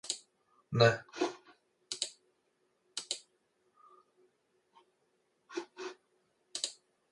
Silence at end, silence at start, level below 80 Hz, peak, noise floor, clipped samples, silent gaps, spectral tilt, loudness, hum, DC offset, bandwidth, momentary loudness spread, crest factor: 0.4 s; 0.05 s; -74 dBFS; -12 dBFS; -77 dBFS; under 0.1%; none; -4 dB/octave; -36 LUFS; none; under 0.1%; 11.5 kHz; 18 LU; 28 dB